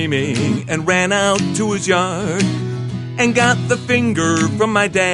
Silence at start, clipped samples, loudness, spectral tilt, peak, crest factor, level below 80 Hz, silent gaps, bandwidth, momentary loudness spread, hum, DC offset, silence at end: 0 s; under 0.1%; -16 LUFS; -4.5 dB/octave; 0 dBFS; 16 dB; -46 dBFS; none; 11.5 kHz; 5 LU; none; under 0.1%; 0 s